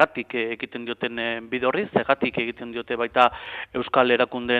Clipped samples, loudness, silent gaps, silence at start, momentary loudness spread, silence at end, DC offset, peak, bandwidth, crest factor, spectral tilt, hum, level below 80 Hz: under 0.1%; -24 LUFS; none; 0 s; 11 LU; 0 s; under 0.1%; -2 dBFS; 8 kHz; 22 dB; -6.5 dB/octave; none; -58 dBFS